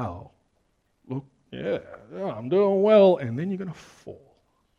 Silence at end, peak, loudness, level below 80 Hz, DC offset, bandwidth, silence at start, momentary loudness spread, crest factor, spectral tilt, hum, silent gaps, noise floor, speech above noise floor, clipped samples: 0.65 s; -6 dBFS; -23 LUFS; -62 dBFS; under 0.1%; 7.2 kHz; 0 s; 26 LU; 20 dB; -8 dB/octave; none; none; -70 dBFS; 46 dB; under 0.1%